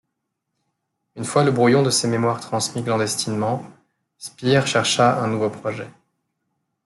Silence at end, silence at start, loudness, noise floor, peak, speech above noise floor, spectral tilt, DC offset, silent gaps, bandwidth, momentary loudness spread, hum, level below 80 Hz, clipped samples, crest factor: 0.95 s; 1.15 s; -20 LUFS; -78 dBFS; -2 dBFS; 58 dB; -4.5 dB/octave; under 0.1%; none; 12.5 kHz; 14 LU; none; -64 dBFS; under 0.1%; 20 dB